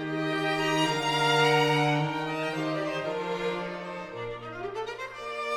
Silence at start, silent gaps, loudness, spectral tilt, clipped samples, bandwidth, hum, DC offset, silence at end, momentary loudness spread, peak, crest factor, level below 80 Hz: 0 s; none; -28 LUFS; -4.5 dB/octave; under 0.1%; 18 kHz; none; under 0.1%; 0 s; 14 LU; -12 dBFS; 18 dB; -60 dBFS